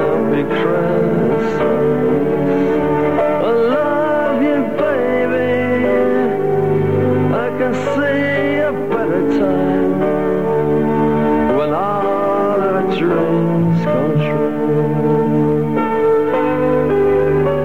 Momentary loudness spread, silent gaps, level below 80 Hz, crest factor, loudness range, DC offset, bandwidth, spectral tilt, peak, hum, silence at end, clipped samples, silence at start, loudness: 2 LU; none; -44 dBFS; 10 dB; 1 LU; 2%; 15.5 kHz; -8.5 dB/octave; -4 dBFS; none; 0 s; under 0.1%; 0 s; -16 LUFS